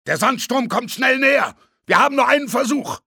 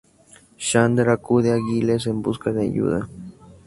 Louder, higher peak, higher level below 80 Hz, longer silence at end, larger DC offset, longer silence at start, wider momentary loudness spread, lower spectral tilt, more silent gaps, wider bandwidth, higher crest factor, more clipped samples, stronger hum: first, -17 LUFS vs -21 LUFS; about the same, -2 dBFS vs -2 dBFS; second, -66 dBFS vs -50 dBFS; about the same, 0.1 s vs 0.15 s; neither; second, 0.05 s vs 0.6 s; second, 7 LU vs 11 LU; second, -3 dB/octave vs -6 dB/octave; neither; first, 19.5 kHz vs 11.5 kHz; about the same, 16 dB vs 20 dB; neither; neither